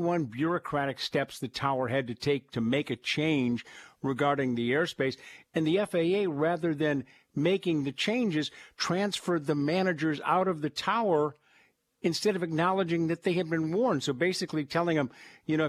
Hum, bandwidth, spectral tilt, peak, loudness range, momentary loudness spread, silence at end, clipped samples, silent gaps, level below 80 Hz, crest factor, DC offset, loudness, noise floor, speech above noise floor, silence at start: none; 14.5 kHz; -5.5 dB/octave; -12 dBFS; 1 LU; 6 LU; 0 s; under 0.1%; none; -70 dBFS; 18 dB; under 0.1%; -29 LUFS; -66 dBFS; 37 dB; 0 s